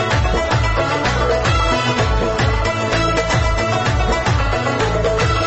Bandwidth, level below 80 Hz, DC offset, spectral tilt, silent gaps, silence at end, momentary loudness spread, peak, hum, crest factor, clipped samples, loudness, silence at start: 8.4 kHz; -24 dBFS; under 0.1%; -5 dB/octave; none; 0 s; 2 LU; -6 dBFS; none; 10 dB; under 0.1%; -17 LUFS; 0 s